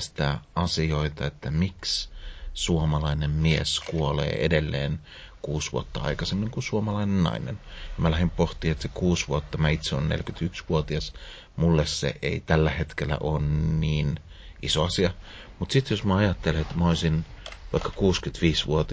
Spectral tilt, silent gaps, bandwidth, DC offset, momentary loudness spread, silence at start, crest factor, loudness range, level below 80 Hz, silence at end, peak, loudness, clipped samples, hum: -5.5 dB/octave; none; 8 kHz; under 0.1%; 11 LU; 0 s; 20 dB; 2 LU; -36 dBFS; 0 s; -6 dBFS; -26 LUFS; under 0.1%; none